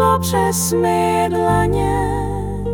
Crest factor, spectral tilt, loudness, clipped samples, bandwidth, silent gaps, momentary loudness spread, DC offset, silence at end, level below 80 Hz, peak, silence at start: 12 dB; -5.5 dB/octave; -17 LUFS; under 0.1%; 18 kHz; none; 6 LU; under 0.1%; 0 s; -30 dBFS; -4 dBFS; 0 s